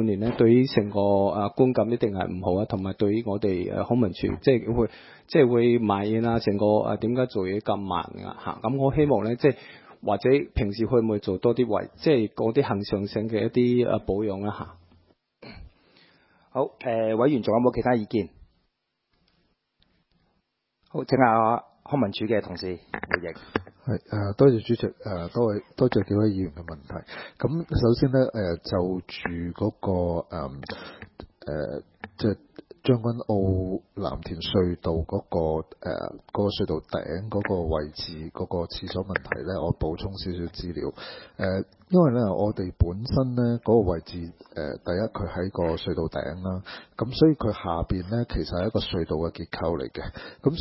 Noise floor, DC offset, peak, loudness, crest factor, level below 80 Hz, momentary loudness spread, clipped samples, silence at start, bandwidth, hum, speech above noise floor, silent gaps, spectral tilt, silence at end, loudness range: -76 dBFS; under 0.1%; -2 dBFS; -26 LUFS; 22 dB; -42 dBFS; 13 LU; under 0.1%; 0 s; 5.8 kHz; none; 51 dB; none; -11.5 dB/octave; 0 s; 7 LU